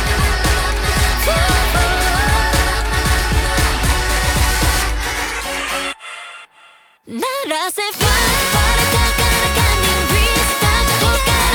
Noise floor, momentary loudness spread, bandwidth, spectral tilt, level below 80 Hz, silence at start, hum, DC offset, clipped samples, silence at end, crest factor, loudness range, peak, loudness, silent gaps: -47 dBFS; 7 LU; over 20 kHz; -3 dB/octave; -20 dBFS; 0 s; none; under 0.1%; under 0.1%; 0 s; 14 dB; 6 LU; -2 dBFS; -15 LUFS; none